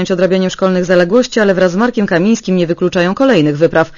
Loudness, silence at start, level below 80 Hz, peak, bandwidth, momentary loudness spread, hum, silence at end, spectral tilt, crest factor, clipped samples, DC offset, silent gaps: -12 LUFS; 0 s; -46 dBFS; 0 dBFS; 7.4 kHz; 3 LU; none; 0 s; -6 dB/octave; 12 dB; 0.3%; under 0.1%; none